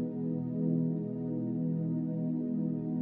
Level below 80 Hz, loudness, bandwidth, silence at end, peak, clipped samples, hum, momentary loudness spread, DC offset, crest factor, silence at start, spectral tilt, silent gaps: -74 dBFS; -33 LUFS; 2 kHz; 0 s; -20 dBFS; under 0.1%; none; 4 LU; under 0.1%; 14 dB; 0 s; -14 dB/octave; none